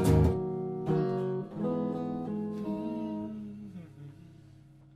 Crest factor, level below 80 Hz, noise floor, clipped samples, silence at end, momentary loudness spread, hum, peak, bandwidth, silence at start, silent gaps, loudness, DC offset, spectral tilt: 20 dB; -44 dBFS; -55 dBFS; under 0.1%; 0.2 s; 18 LU; 50 Hz at -55 dBFS; -12 dBFS; 15.5 kHz; 0 s; none; -32 LUFS; under 0.1%; -8.5 dB/octave